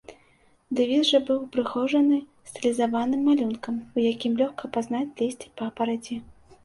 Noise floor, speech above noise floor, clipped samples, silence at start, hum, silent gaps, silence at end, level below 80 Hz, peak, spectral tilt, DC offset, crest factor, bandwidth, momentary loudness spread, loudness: -61 dBFS; 36 dB; under 0.1%; 0.1 s; none; none; 0.4 s; -64 dBFS; -8 dBFS; -4.5 dB/octave; under 0.1%; 18 dB; 11.5 kHz; 11 LU; -25 LUFS